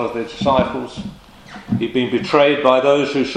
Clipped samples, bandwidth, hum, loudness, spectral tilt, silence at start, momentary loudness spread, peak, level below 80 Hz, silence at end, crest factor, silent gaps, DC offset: under 0.1%; 10 kHz; none; -17 LUFS; -6 dB/octave; 0 s; 17 LU; 0 dBFS; -46 dBFS; 0 s; 18 dB; none; under 0.1%